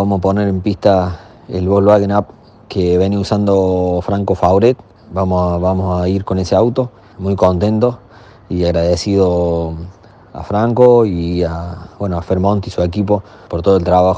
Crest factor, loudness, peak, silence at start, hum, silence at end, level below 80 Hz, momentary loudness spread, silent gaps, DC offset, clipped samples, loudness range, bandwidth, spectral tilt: 14 dB; -15 LUFS; 0 dBFS; 0 s; none; 0 s; -36 dBFS; 13 LU; none; under 0.1%; 0.1%; 2 LU; 8.6 kHz; -8 dB/octave